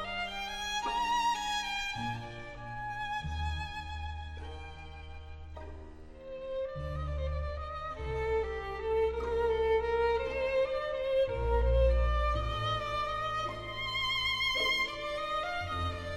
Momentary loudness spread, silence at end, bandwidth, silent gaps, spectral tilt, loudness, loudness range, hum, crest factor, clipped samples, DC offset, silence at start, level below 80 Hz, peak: 16 LU; 0 s; 14.5 kHz; none; -4 dB/octave; -33 LUFS; 11 LU; none; 16 dB; under 0.1%; under 0.1%; 0 s; -40 dBFS; -16 dBFS